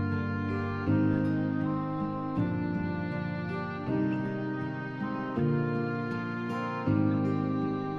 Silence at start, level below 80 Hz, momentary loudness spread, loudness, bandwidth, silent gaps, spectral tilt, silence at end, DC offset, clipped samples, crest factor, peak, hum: 0 s; -58 dBFS; 7 LU; -31 LUFS; 6.6 kHz; none; -9.5 dB/octave; 0 s; under 0.1%; under 0.1%; 16 dB; -14 dBFS; none